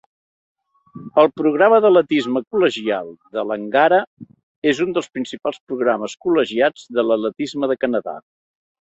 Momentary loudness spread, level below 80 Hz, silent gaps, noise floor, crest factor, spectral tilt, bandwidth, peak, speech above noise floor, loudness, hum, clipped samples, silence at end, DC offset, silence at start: 12 LU; -64 dBFS; 2.47-2.51 s, 4.07-4.17 s, 4.43-4.62 s, 5.60-5.67 s; -41 dBFS; 18 dB; -5 dB/octave; 8.2 kHz; -2 dBFS; 23 dB; -18 LUFS; none; under 0.1%; 0.6 s; under 0.1%; 0.95 s